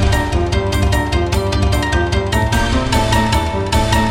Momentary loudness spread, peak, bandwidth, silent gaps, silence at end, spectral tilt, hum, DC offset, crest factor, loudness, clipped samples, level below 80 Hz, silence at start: 3 LU; 0 dBFS; 16.5 kHz; none; 0 s; -5 dB/octave; none; under 0.1%; 14 dB; -16 LUFS; under 0.1%; -20 dBFS; 0 s